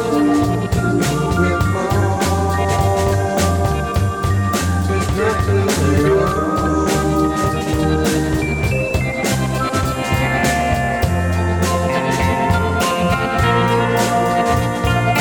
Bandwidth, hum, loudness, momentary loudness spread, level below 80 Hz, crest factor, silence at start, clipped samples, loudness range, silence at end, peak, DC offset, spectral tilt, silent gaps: 19.5 kHz; none; -17 LUFS; 3 LU; -28 dBFS; 14 dB; 0 s; under 0.1%; 1 LU; 0 s; -2 dBFS; under 0.1%; -5.5 dB/octave; none